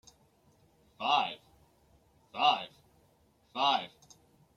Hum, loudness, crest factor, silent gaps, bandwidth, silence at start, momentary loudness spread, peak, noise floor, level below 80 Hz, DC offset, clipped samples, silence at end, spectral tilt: none; -31 LUFS; 24 dB; none; 13 kHz; 1 s; 19 LU; -12 dBFS; -68 dBFS; -74 dBFS; under 0.1%; under 0.1%; 0.7 s; -2.5 dB/octave